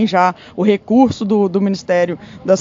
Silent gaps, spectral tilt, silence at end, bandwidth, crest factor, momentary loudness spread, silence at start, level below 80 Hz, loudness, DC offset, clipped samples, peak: none; -6.5 dB/octave; 0 s; 7.6 kHz; 14 dB; 5 LU; 0 s; -52 dBFS; -16 LUFS; under 0.1%; under 0.1%; 0 dBFS